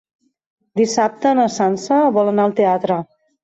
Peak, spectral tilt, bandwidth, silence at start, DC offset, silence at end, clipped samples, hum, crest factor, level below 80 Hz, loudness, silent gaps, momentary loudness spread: -4 dBFS; -5.5 dB/octave; 8.2 kHz; 0.75 s; under 0.1%; 0.4 s; under 0.1%; none; 14 dB; -64 dBFS; -17 LUFS; none; 6 LU